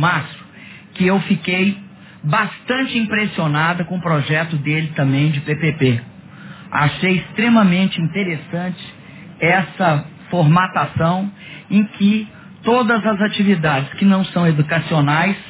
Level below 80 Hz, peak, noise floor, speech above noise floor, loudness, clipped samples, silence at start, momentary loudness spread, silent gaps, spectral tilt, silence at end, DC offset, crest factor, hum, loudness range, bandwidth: -52 dBFS; -2 dBFS; -40 dBFS; 23 dB; -17 LUFS; under 0.1%; 0 s; 10 LU; none; -10.5 dB/octave; 0 s; under 0.1%; 16 dB; none; 2 LU; 4 kHz